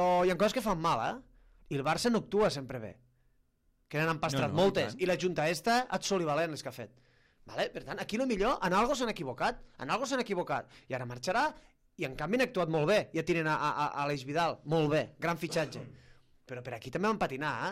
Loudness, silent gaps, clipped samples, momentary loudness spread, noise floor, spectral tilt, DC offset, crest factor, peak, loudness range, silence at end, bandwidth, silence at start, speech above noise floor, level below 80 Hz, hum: -32 LUFS; none; under 0.1%; 12 LU; -72 dBFS; -5 dB/octave; under 0.1%; 16 dB; -16 dBFS; 3 LU; 0 s; 15.5 kHz; 0 s; 40 dB; -58 dBFS; none